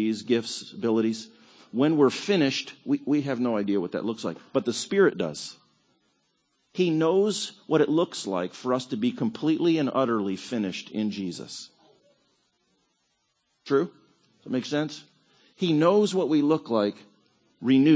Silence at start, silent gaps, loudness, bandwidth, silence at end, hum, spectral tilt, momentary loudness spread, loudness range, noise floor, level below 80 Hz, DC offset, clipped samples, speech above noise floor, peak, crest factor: 0 s; none; -26 LUFS; 8 kHz; 0 s; none; -5.5 dB/octave; 12 LU; 8 LU; -73 dBFS; -74 dBFS; under 0.1%; under 0.1%; 49 dB; -8 dBFS; 18 dB